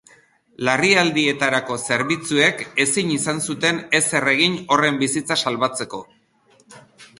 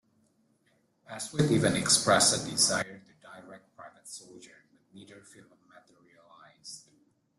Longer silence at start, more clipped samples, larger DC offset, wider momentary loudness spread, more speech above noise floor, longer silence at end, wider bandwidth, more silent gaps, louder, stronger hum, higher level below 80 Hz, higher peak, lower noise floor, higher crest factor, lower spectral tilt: second, 0.6 s vs 1.1 s; neither; neither; second, 7 LU vs 27 LU; second, 38 dB vs 43 dB; second, 0.15 s vs 0.6 s; about the same, 11.5 kHz vs 12.5 kHz; neither; first, -19 LUFS vs -25 LUFS; neither; about the same, -62 dBFS vs -64 dBFS; first, 0 dBFS vs -10 dBFS; second, -57 dBFS vs -71 dBFS; about the same, 20 dB vs 22 dB; about the same, -3 dB/octave vs -3 dB/octave